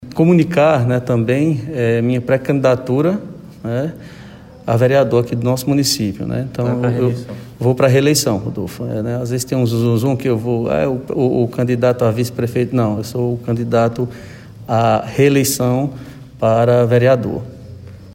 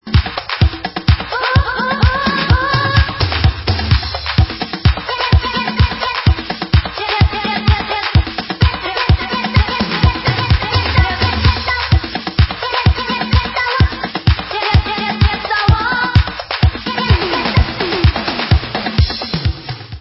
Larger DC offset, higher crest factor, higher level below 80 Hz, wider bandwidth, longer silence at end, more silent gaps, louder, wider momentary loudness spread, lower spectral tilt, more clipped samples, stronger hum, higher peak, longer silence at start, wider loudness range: neither; about the same, 14 dB vs 14 dB; second, -46 dBFS vs -20 dBFS; first, 16.5 kHz vs 5.8 kHz; about the same, 0 s vs 0 s; neither; about the same, -16 LUFS vs -15 LUFS; first, 13 LU vs 4 LU; second, -6 dB/octave vs -8.5 dB/octave; neither; neither; about the same, -2 dBFS vs 0 dBFS; about the same, 0 s vs 0.05 s; about the same, 3 LU vs 1 LU